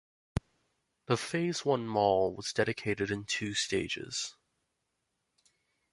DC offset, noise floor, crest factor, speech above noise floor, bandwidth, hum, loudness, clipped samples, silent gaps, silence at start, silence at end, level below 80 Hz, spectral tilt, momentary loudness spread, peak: under 0.1%; -82 dBFS; 20 dB; 50 dB; 11.5 kHz; none; -32 LUFS; under 0.1%; none; 0.35 s; 1.6 s; -58 dBFS; -4 dB/octave; 12 LU; -14 dBFS